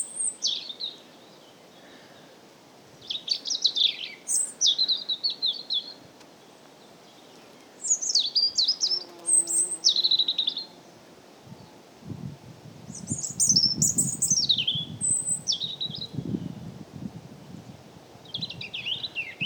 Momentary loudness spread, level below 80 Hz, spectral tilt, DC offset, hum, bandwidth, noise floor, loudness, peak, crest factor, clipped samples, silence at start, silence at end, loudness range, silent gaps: 20 LU; -66 dBFS; -0.5 dB/octave; under 0.1%; none; over 20 kHz; -52 dBFS; -24 LUFS; -8 dBFS; 22 dB; under 0.1%; 0 s; 0 s; 11 LU; none